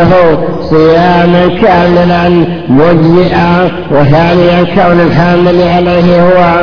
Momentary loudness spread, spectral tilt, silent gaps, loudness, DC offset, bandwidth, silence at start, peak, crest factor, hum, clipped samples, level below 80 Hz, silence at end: 4 LU; -8.5 dB/octave; none; -6 LUFS; under 0.1%; 5.4 kHz; 0 s; 0 dBFS; 6 dB; none; 5%; -28 dBFS; 0 s